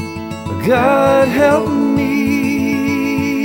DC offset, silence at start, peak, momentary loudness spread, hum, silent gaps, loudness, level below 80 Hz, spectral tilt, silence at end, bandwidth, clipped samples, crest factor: under 0.1%; 0 s; 0 dBFS; 8 LU; none; none; -14 LUFS; -44 dBFS; -6 dB/octave; 0 s; 17.5 kHz; under 0.1%; 14 dB